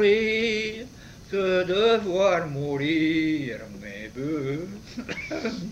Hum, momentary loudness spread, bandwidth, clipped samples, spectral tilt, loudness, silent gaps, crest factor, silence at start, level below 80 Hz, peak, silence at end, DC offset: none; 16 LU; 15 kHz; under 0.1%; -5.5 dB/octave; -25 LUFS; none; 16 dB; 0 s; -52 dBFS; -10 dBFS; 0 s; under 0.1%